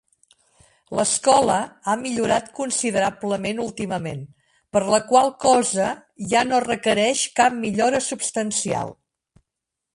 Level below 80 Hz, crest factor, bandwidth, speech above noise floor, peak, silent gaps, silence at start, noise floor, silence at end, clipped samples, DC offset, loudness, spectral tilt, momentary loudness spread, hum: -58 dBFS; 20 dB; 11.5 kHz; 63 dB; -2 dBFS; none; 0.9 s; -84 dBFS; 1.05 s; under 0.1%; under 0.1%; -21 LUFS; -3 dB/octave; 10 LU; none